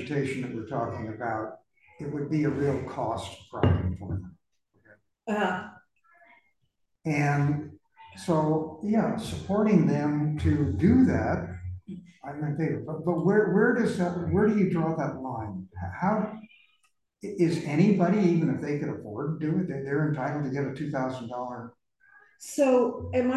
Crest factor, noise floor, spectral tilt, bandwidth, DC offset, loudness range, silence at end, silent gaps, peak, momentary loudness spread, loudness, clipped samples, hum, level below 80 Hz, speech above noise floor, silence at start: 18 dB; -76 dBFS; -8 dB/octave; 12.5 kHz; under 0.1%; 6 LU; 0 s; none; -10 dBFS; 15 LU; -27 LUFS; under 0.1%; none; -46 dBFS; 50 dB; 0 s